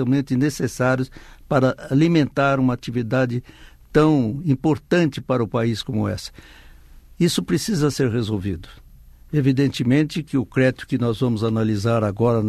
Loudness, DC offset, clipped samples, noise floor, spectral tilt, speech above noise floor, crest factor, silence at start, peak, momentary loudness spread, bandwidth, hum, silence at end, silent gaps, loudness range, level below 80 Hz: -21 LUFS; under 0.1%; under 0.1%; -45 dBFS; -6.5 dB/octave; 25 dB; 18 dB; 0 s; -4 dBFS; 7 LU; 13.5 kHz; none; 0 s; none; 3 LU; -46 dBFS